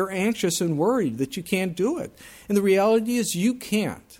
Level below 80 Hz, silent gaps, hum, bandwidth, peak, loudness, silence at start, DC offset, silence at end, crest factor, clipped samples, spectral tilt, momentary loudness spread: -60 dBFS; none; none; 17 kHz; -10 dBFS; -23 LUFS; 0 s; under 0.1%; 0.05 s; 14 dB; under 0.1%; -5 dB/octave; 8 LU